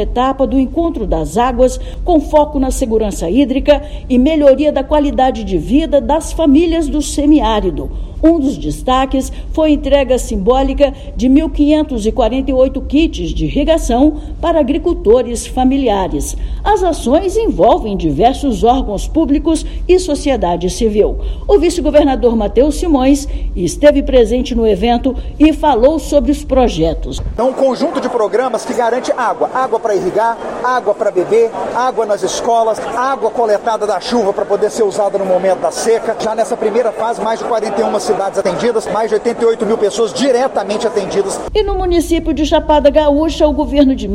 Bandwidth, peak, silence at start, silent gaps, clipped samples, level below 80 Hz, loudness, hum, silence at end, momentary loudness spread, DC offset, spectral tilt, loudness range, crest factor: 14 kHz; 0 dBFS; 0 s; none; 0.2%; -24 dBFS; -13 LUFS; none; 0 s; 6 LU; under 0.1%; -5.5 dB/octave; 3 LU; 12 dB